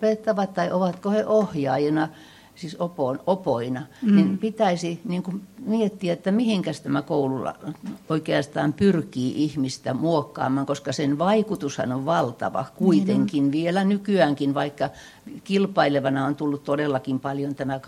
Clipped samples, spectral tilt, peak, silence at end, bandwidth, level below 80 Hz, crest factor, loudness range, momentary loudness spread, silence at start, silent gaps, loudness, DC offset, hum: under 0.1%; -6.5 dB/octave; -4 dBFS; 0 s; 13 kHz; -62 dBFS; 20 dB; 2 LU; 9 LU; 0 s; none; -24 LUFS; under 0.1%; none